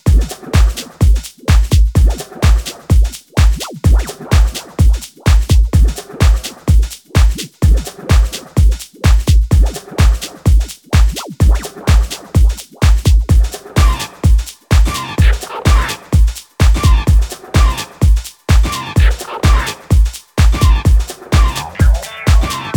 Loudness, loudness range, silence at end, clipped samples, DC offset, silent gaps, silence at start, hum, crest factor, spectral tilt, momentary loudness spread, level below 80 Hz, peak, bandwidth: -14 LUFS; 1 LU; 0 s; under 0.1%; under 0.1%; none; 0.05 s; none; 10 dB; -5.5 dB/octave; 5 LU; -12 dBFS; 0 dBFS; 18.5 kHz